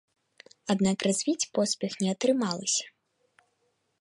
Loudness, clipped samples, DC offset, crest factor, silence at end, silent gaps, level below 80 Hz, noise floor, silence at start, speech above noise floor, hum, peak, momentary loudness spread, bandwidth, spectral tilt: -28 LUFS; under 0.1%; under 0.1%; 18 dB; 1.15 s; none; -70 dBFS; -74 dBFS; 0.65 s; 47 dB; none; -12 dBFS; 5 LU; 11.5 kHz; -4 dB/octave